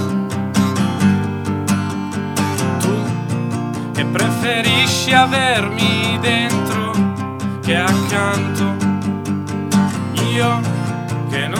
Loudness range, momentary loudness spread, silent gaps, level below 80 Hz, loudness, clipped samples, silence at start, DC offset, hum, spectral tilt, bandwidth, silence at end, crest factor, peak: 4 LU; 9 LU; none; -52 dBFS; -17 LUFS; under 0.1%; 0 s; 0.1%; none; -5 dB/octave; 17 kHz; 0 s; 16 dB; 0 dBFS